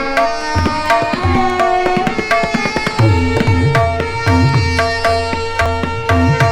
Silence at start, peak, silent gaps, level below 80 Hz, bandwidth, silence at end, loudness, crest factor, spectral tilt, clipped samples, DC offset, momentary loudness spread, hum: 0 s; -2 dBFS; none; -28 dBFS; 14 kHz; 0 s; -14 LUFS; 12 dB; -6 dB/octave; under 0.1%; under 0.1%; 4 LU; none